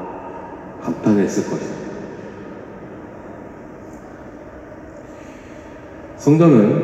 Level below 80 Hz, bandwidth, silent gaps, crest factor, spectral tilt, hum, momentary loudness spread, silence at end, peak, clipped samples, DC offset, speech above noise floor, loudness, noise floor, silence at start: -52 dBFS; 12 kHz; none; 20 dB; -8 dB/octave; none; 23 LU; 0 s; 0 dBFS; under 0.1%; under 0.1%; 22 dB; -18 LUFS; -37 dBFS; 0 s